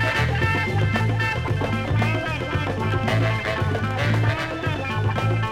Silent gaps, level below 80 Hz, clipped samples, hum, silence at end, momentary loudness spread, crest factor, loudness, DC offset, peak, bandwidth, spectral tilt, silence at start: none; -38 dBFS; under 0.1%; none; 0 s; 4 LU; 14 dB; -23 LUFS; under 0.1%; -8 dBFS; 12 kHz; -6.5 dB/octave; 0 s